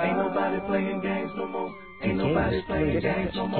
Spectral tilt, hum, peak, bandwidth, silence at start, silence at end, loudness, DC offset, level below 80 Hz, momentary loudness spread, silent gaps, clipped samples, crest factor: -10.5 dB/octave; none; -12 dBFS; 4.5 kHz; 0 s; 0 s; -27 LUFS; 0.2%; -44 dBFS; 7 LU; none; under 0.1%; 14 dB